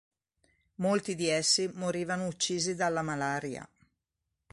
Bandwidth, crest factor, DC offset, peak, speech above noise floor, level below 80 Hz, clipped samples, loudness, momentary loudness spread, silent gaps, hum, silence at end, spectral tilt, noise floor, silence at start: 11.5 kHz; 20 dB; under 0.1%; -14 dBFS; 54 dB; -68 dBFS; under 0.1%; -30 LUFS; 8 LU; none; none; 0.85 s; -3 dB/octave; -85 dBFS; 0.8 s